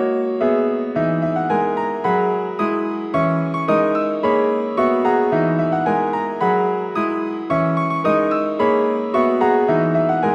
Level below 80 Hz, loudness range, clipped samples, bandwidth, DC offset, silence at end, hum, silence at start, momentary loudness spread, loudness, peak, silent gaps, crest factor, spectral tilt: -56 dBFS; 2 LU; under 0.1%; 8 kHz; under 0.1%; 0 s; none; 0 s; 5 LU; -19 LUFS; -4 dBFS; none; 14 dB; -8.5 dB/octave